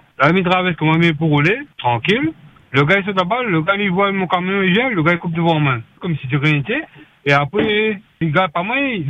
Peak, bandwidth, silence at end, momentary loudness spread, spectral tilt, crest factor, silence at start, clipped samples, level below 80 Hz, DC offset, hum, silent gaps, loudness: 0 dBFS; 7.8 kHz; 0 s; 7 LU; -7.5 dB/octave; 16 dB; 0.2 s; under 0.1%; -52 dBFS; under 0.1%; none; none; -16 LUFS